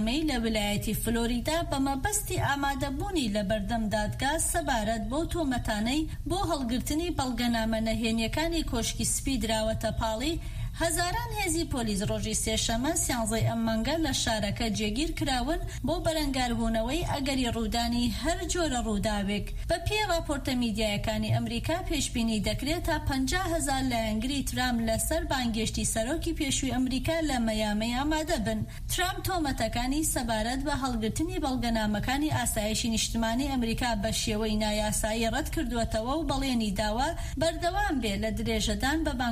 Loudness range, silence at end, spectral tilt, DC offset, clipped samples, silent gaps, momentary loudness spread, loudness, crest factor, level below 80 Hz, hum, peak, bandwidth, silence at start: 1 LU; 0 s; -4 dB/octave; under 0.1%; under 0.1%; none; 3 LU; -29 LUFS; 14 dB; -38 dBFS; none; -14 dBFS; 15.5 kHz; 0 s